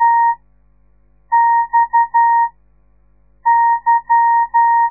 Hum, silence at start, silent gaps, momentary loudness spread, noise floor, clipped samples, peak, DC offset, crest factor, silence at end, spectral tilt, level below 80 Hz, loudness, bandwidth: 50 Hz at -55 dBFS; 0 s; none; 5 LU; -55 dBFS; under 0.1%; -4 dBFS; 0.2%; 10 dB; 0 s; -6.5 dB/octave; -54 dBFS; -14 LUFS; 2.1 kHz